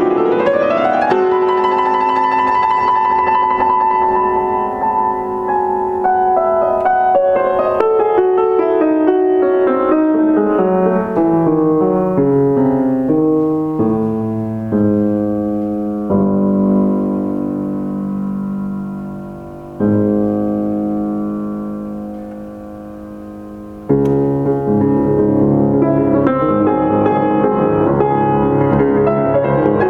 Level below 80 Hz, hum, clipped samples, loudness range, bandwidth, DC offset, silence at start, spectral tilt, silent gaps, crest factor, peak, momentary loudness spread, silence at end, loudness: -42 dBFS; none; under 0.1%; 6 LU; 5.8 kHz; under 0.1%; 0 s; -9.5 dB/octave; none; 14 dB; 0 dBFS; 10 LU; 0 s; -14 LUFS